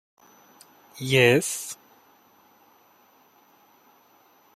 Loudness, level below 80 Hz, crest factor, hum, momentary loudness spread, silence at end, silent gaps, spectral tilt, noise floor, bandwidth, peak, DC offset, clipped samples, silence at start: -22 LUFS; -68 dBFS; 24 dB; none; 23 LU; 2.8 s; none; -4 dB/octave; -59 dBFS; 15.5 kHz; -4 dBFS; under 0.1%; under 0.1%; 0.95 s